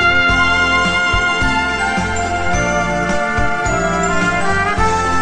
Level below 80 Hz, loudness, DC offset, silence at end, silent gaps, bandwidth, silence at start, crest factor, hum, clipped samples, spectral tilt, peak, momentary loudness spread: -28 dBFS; -15 LUFS; under 0.1%; 0 s; none; 10.5 kHz; 0 s; 14 dB; none; under 0.1%; -4 dB/octave; -2 dBFS; 5 LU